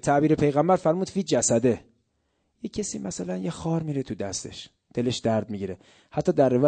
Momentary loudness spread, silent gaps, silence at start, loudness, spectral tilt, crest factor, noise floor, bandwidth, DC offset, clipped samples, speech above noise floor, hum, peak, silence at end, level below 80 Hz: 13 LU; none; 0 s; -26 LUFS; -5.5 dB/octave; 16 dB; -73 dBFS; 9.2 kHz; under 0.1%; under 0.1%; 48 dB; none; -8 dBFS; 0 s; -56 dBFS